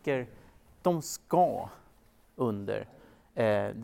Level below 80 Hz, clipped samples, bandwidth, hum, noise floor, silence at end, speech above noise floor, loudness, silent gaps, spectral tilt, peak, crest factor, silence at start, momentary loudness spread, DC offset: -64 dBFS; under 0.1%; 16.5 kHz; none; -62 dBFS; 0 s; 32 dB; -31 LUFS; none; -6 dB/octave; -12 dBFS; 18 dB; 0.05 s; 16 LU; under 0.1%